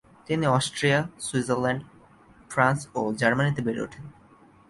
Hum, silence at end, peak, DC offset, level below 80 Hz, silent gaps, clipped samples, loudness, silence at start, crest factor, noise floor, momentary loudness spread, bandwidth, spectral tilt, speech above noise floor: none; 0.6 s; -4 dBFS; under 0.1%; -60 dBFS; none; under 0.1%; -25 LUFS; 0.3 s; 22 dB; -55 dBFS; 9 LU; 11.5 kHz; -5 dB/octave; 30 dB